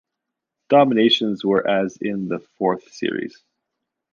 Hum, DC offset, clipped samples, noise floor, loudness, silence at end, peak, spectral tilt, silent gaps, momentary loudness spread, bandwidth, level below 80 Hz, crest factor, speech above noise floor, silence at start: none; under 0.1%; under 0.1%; -82 dBFS; -20 LUFS; 0.85 s; -2 dBFS; -5.5 dB/octave; none; 12 LU; 7.2 kHz; -66 dBFS; 18 dB; 63 dB; 0.7 s